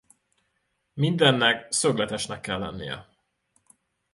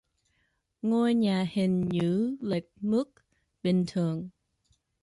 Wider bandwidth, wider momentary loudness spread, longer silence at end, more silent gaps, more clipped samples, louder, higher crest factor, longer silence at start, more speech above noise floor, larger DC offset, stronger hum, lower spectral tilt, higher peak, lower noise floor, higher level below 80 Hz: about the same, 11.5 kHz vs 11.5 kHz; first, 17 LU vs 9 LU; first, 1.1 s vs 0.75 s; neither; neither; first, -24 LUFS vs -28 LUFS; first, 22 dB vs 14 dB; about the same, 0.95 s vs 0.85 s; about the same, 50 dB vs 47 dB; neither; neither; second, -3.5 dB/octave vs -8 dB/octave; first, -6 dBFS vs -16 dBFS; about the same, -75 dBFS vs -75 dBFS; first, -58 dBFS vs -66 dBFS